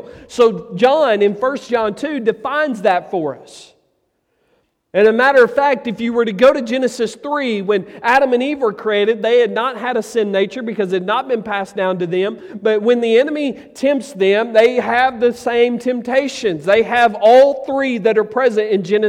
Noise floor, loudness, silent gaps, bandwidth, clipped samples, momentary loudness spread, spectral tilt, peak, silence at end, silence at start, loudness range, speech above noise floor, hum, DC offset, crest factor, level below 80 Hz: -66 dBFS; -16 LUFS; none; 12 kHz; under 0.1%; 8 LU; -5 dB/octave; -2 dBFS; 0 s; 0.05 s; 4 LU; 50 dB; none; under 0.1%; 14 dB; -58 dBFS